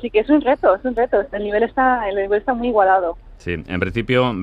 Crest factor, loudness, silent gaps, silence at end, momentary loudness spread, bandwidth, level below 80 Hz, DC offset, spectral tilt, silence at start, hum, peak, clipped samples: 16 dB; -18 LUFS; none; 0 s; 10 LU; 7.8 kHz; -42 dBFS; under 0.1%; -8 dB/octave; 0 s; none; -2 dBFS; under 0.1%